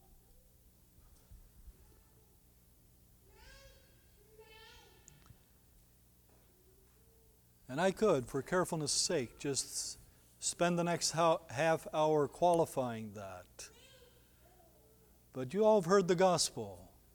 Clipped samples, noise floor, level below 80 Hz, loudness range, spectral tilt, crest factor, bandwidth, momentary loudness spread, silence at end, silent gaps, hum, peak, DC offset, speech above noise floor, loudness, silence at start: under 0.1%; -66 dBFS; -66 dBFS; 6 LU; -4 dB/octave; 22 dB; 19.5 kHz; 20 LU; 0.3 s; none; 60 Hz at -65 dBFS; -16 dBFS; under 0.1%; 33 dB; -33 LUFS; 1.3 s